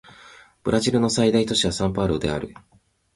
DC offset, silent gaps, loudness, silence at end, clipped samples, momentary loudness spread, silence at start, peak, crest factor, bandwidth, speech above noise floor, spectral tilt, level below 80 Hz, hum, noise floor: under 0.1%; none; -22 LUFS; 0.65 s; under 0.1%; 11 LU; 0.25 s; -6 dBFS; 18 dB; 11.5 kHz; 27 dB; -5 dB/octave; -44 dBFS; none; -49 dBFS